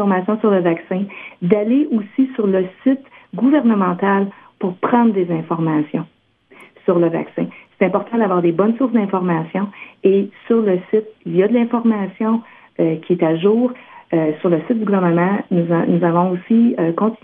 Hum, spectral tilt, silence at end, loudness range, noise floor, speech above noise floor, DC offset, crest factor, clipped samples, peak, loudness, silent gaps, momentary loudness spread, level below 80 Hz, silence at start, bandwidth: none; -11 dB/octave; 0.1 s; 2 LU; -47 dBFS; 31 dB; under 0.1%; 16 dB; under 0.1%; 0 dBFS; -17 LUFS; none; 9 LU; -68 dBFS; 0 s; 3.7 kHz